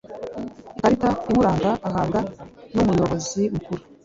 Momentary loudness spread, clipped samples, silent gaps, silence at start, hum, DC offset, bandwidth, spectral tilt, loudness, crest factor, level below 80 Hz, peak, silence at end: 14 LU; under 0.1%; none; 0.05 s; none; under 0.1%; 7.8 kHz; -6.5 dB/octave; -22 LUFS; 18 dB; -44 dBFS; -4 dBFS; 0.25 s